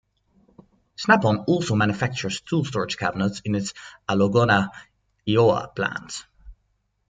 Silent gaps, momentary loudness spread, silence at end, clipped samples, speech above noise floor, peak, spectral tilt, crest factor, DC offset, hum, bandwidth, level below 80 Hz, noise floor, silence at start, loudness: none; 14 LU; 0.55 s; under 0.1%; 48 dB; -2 dBFS; -5.5 dB/octave; 22 dB; under 0.1%; none; 9.4 kHz; -56 dBFS; -71 dBFS; 1 s; -23 LUFS